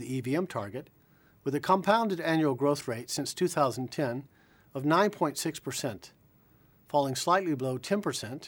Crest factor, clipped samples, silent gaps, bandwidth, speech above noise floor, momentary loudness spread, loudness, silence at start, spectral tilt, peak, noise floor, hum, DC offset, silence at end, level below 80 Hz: 20 dB; under 0.1%; none; 19 kHz; 33 dB; 11 LU; -30 LUFS; 0 s; -5 dB/octave; -10 dBFS; -62 dBFS; none; under 0.1%; 0 s; -70 dBFS